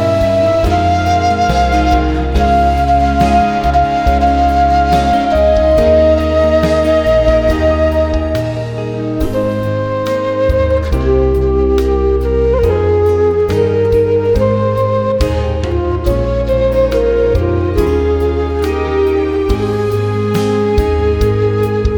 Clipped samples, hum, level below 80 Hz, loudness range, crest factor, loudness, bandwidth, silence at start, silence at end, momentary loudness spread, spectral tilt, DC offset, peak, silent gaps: under 0.1%; none; -20 dBFS; 3 LU; 12 dB; -13 LUFS; 18.5 kHz; 0 s; 0 s; 5 LU; -7.5 dB/octave; 0.1%; 0 dBFS; none